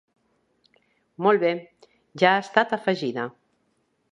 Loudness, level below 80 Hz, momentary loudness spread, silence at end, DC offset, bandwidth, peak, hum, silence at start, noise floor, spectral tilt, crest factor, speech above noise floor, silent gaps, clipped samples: -23 LUFS; -74 dBFS; 12 LU; 0.85 s; under 0.1%; 10 kHz; -2 dBFS; none; 1.2 s; -70 dBFS; -5.5 dB/octave; 24 dB; 48 dB; none; under 0.1%